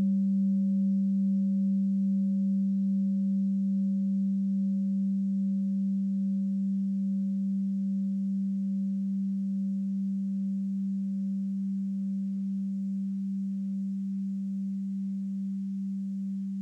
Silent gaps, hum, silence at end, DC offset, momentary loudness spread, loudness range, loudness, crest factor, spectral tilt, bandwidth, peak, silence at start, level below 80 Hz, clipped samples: none; none; 0 s; under 0.1%; 6 LU; 5 LU; -30 LUFS; 6 dB; -11.5 dB/octave; 0.6 kHz; -22 dBFS; 0 s; -80 dBFS; under 0.1%